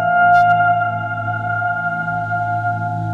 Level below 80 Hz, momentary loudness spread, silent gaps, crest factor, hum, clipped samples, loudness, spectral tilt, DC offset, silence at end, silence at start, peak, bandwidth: -52 dBFS; 10 LU; none; 12 dB; none; under 0.1%; -17 LUFS; -7.5 dB/octave; under 0.1%; 0 s; 0 s; -4 dBFS; 6.8 kHz